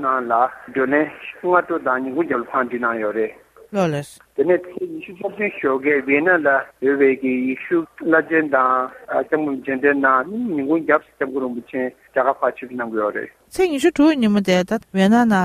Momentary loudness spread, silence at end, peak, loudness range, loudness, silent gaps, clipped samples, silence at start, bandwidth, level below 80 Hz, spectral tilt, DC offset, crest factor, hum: 10 LU; 0 s; 0 dBFS; 4 LU; -19 LUFS; none; under 0.1%; 0 s; 14.5 kHz; -58 dBFS; -6 dB/octave; under 0.1%; 18 dB; none